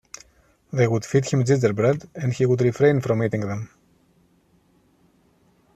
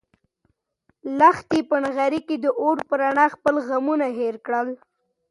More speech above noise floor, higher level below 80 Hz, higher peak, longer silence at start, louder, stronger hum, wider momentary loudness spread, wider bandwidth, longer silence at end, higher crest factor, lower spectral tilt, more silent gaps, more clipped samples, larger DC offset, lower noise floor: second, 40 dB vs 49 dB; first, -58 dBFS vs -64 dBFS; about the same, -4 dBFS vs -4 dBFS; second, 0.75 s vs 1.05 s; about the same, -22 LUFS vs -21 LUFS; neither; first, 13 LU vs 10 LU; second, 8.8 kHz vs 11.5 kHz; first, 2.1 s vs 0.55 s; about the same, 18 dB vs 20 dB; first, -7 dB/octave vs -5.5 dB/octave; neither; neither; neither; second, -61 dBFS vs -70 dBFS